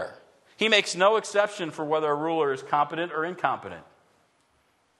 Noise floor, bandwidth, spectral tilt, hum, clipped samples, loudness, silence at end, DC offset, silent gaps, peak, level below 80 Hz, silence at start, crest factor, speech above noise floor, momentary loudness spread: -67 dBFS; 12 kHz; -3 dB/octave; none; under 0.1%; -25 LUFS; 1.2 s; under 0.1%; none; -6 dBFS; -76 dBFS; 0 s; 22 dB; 42 dB; 12 LU